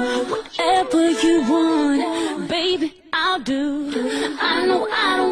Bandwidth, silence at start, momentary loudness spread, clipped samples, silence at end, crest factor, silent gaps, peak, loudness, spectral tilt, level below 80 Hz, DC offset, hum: 13 kHz; 0 s; 6 LU; under 0.1%; 0 s; 14 dB; none; -6 dBFS; -20 LUFS; -3 dB/octave; -52 dBFS; under 0.1%; none